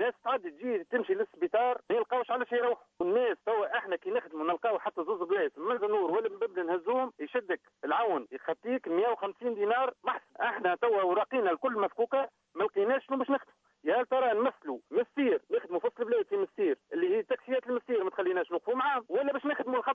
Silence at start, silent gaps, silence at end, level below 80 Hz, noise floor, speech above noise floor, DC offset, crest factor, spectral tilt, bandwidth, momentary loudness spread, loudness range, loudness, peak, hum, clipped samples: 0 s; none; 0 s; -84 dBFS; -51 dBFS; 20 dB; under 0.1%; 16 dB; -6.5 dB/octave; 4.7 kHz; 5 LU; 2 LU; -31 LUFS; -16 dBFS; none; under 0.1%